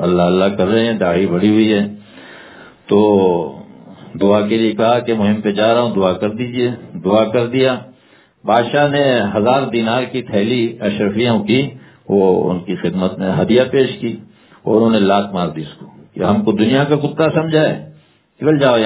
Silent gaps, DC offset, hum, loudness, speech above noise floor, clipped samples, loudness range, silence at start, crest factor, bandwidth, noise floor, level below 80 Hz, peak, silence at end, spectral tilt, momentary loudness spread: none; under 0.1%; none; -15 LUFS; 36 dB; under 0.1%; 1 LU; 0 s; 16 dB; 4 kHz; -50 dBFS; -48 dBFS; 0 dBFS; 0 s; -11 dB/octave; 9 LU